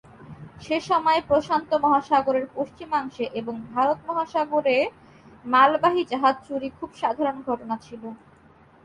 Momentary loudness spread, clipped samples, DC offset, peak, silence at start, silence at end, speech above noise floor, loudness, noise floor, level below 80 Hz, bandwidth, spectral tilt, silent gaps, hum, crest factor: 14 LU; under 0.1%; under 0.1%; -6 dBFS; 0.2 s; 0.7 s; 30 dB; -23 LUFS; -54 dBFS; -60 dBFS; 11 kHz; -5.5 dB/octave; none; none; 18 dB